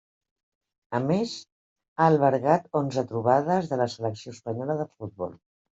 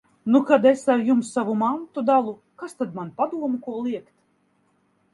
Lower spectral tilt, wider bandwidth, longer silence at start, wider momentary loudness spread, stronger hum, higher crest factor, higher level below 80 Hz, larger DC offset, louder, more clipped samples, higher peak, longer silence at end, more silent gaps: about the same, -7 dB/octave vs -6 dB/octave; second, 8 kHz vs 11.5 kHz; first, 0.9 s vs 0.25 s; about the same, 15 LU vs 14 LU; neither; about the same, 20 dB vs 22 dB; first, -68 dBFS vs -74 dBFS; neither; second, -26 LUFS vs -22 LUFS; neither; second, -6 dBFS vs -2 dBFS; second, 0.45 s vs 1.1 s; first, 1.52-1.76 s, 1.88-1.96 s vs none